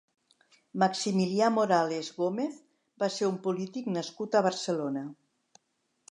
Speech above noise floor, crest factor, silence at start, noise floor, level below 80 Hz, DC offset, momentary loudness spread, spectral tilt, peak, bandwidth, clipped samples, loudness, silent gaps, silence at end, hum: 48 dB; 20 dB; 0.75 s; -77 dBFS; -82 dBFS; under 0.1%; 9 LU; -5 dB/octave; -10 dBFS; 11 kHz; under 0.1%; -29 LUFS; none; 0.95 s; none